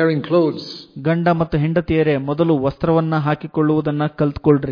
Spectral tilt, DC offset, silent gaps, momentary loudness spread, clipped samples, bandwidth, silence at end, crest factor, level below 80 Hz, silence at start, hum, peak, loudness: -9.5 dB/octave; under 0.1%; none; 4 LU; under 0.1%; 5.2 kHz; 0 s; 16 dB; -42 dBFS; 0 s; none; -2 dBFS; -18 LUFS